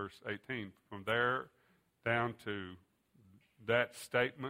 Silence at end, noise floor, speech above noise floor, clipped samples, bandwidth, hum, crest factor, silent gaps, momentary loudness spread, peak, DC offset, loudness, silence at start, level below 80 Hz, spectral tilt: 0 s; -67 dBFS; 30 dB; under 0.1%; 16 kHz; none; 22 dB; none; 14 LU; -16 dBFS; under 0.1%; -37 LUFS; 0 s; -74 dBFS; -5 dB/octave